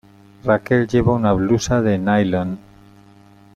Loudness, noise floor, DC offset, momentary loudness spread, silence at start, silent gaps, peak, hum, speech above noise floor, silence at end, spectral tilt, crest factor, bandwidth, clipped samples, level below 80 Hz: -18 LUFS; -47 dBFS; under 0.1%; 9 LU; 0.45 s; none; -2 dBFS; none; 31 dB; 1 s; -6.5 dB/octave; 18 dB; 9.6 kHz; under 0.1%; -40 dBFS